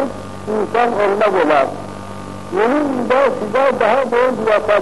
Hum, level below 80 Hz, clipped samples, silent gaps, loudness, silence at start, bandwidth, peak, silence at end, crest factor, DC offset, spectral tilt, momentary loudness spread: none; -48 dBFS; under 0.1%; none; -16 LUFS; 0 s; 11.5 kHz; -4 dBFS; 0 s; 12 dB; 1%; -5.5 dB/octave; 15 LU